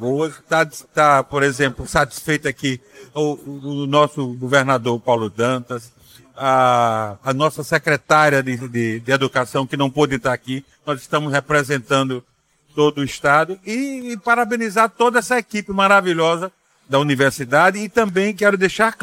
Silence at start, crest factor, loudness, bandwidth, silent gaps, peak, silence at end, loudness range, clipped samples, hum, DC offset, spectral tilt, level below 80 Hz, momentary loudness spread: 0 s; 16 dB; -18 LUFS; 16.5 kHz; none; -2 dBFS; 0.1 s; 3 LU; under 0.1%; none; under 0.1%; -5 dB/octave; -50 dBFS; 10 LU